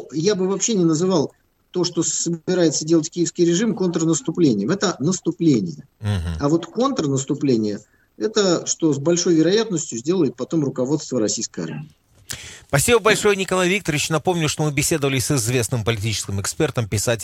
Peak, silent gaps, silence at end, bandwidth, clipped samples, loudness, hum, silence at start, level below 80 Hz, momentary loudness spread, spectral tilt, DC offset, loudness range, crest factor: -2 dBFS; none; 0 s; 16.5 kHz; under 0.1%; -20 LUFS; none; 0 s; -50 dBFS; 8 LU; -4.5 dB/octave; under 0.1%; 3 LU; 18 dB